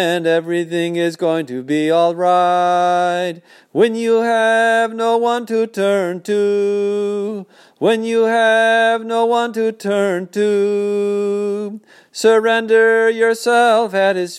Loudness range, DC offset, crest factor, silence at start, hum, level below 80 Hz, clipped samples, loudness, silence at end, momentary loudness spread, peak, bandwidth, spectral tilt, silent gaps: 3 LU; under 0.1%; 14 dB; 0 s; none; -76 dBFS; under 0.1%; -16 LUFS; 0 s; 8 LU; -2 dBFS; 14 kHz; -4.5 dB/octave; none